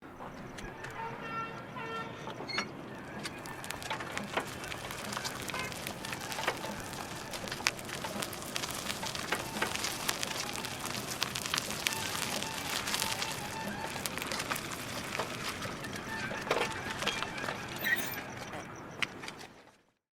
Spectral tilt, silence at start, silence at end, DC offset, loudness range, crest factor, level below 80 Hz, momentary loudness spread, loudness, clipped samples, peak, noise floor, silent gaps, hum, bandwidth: -2.5 dB/octave; 0 s; 0.5 s; under 0.1%; 5 LU; 34 dB; -60 dBFS; 9 LU; -36 LUFS; under 0.1%; -4 dBFS; -62 dBFS; none; none; over 20 kHz